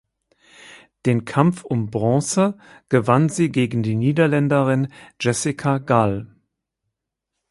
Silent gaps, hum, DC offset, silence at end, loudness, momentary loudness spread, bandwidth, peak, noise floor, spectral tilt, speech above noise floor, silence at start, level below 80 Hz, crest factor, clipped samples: none; none; under 0.1%; 1.25 s; -20 LUFS; 7 LU; 11.5 kHz; -2 dBFS; -81 dBFS; -6.5 dB/octave; 62 dB; 0.7 s; -56 dBFS; 20 dB; under 0.1%